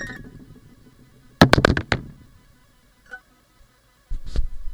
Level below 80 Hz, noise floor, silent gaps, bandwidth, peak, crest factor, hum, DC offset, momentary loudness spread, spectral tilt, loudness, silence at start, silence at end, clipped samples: -32 dBFS; -57 dBFS; none; over 20 kHz; 0 dBFS; 24 dB; none; under 0.1%; 27 LU; -5.5 dB/octave; -20 LUFS; 0 s; 0 s; under 0.1%